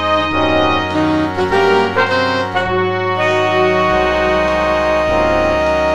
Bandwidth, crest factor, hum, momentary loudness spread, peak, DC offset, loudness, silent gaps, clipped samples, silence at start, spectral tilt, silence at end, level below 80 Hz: 12 kHz; 14 dB; none; 3 LU; 0 dBFS; 1%; -14 LUFS; none; under 0.1%; 0 s; -5.5 dB/octave; 0 s; -34 dBFS